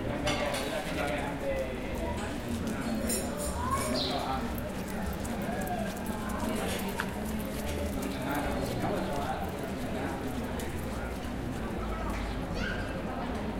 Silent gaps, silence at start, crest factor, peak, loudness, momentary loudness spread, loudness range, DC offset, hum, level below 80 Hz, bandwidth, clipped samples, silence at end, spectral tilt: none; 0 s; 18 dB; -16 dBFS; -34 LUFS; 5 LU; 3 LU; under 0.1%; none; -42 dBFS; 17 kHz; under 0.1%; 0 s; -5 dB/octave